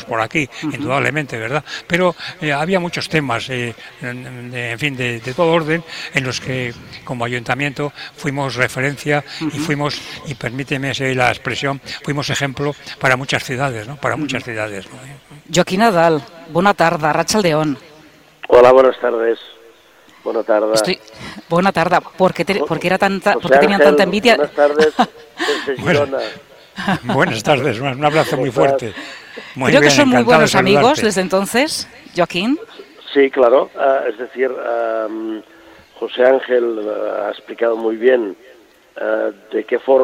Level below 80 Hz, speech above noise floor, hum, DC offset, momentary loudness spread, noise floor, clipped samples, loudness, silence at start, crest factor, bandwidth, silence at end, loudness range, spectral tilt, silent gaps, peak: -52 dBFS; 31 dB; none; under 0.1%; 14 LU; -47 dBFS; under 0.1%; -16 LUFS; 0 s; 16 dB; 16.5 kHz; 0 s; 7 LU; -5 dB/octave; none; 0 dBFS